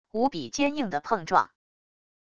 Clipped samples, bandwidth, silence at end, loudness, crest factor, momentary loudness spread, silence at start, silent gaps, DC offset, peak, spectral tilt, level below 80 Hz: under 0.1%; 10 kHz; 0.7 s; -27 LUFS; 22 dB; 6 LU; 0.05 s; none; under 0.1%; -6 dBFS; -4 dB/octave; -62 dBFS